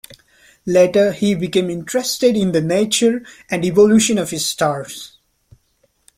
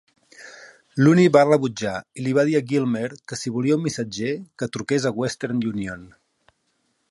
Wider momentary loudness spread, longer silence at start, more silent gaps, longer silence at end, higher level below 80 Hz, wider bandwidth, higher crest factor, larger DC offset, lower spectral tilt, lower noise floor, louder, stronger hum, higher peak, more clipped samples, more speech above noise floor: about the same, 14 LU vs 16 LU; second, 0.1 s vs 0.4 s; neither; about the same, 1.1 s vs 1.05 s; first, -54 dBFS vs -60 dBFS; first, 16.5 kHz vs 11.5 kHz; about the same, 16 dB vs 20 dB; neither; second, -4.5 dB/octave vs -6 dB/octave; second, -62 dBFS vs -70 dBFS; first, -16 LUFS vs -22 LUFS; neither; about the same, -2 dBFS vs -2 dBFS; neither; about the same, 46 dB vs 49 dB